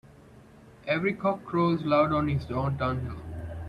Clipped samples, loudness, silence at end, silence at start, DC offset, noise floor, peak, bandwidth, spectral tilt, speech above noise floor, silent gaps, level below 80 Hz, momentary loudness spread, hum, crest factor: under 0.1%; -27 LUFS; 0 s; 0.1 s; under 0.1%; -52 dBFS; -10 dBFS; 10.5 kHz; -8.5 dB/octave; 25 dB; none; -50 dBFS; 14 LU; none; 18 dB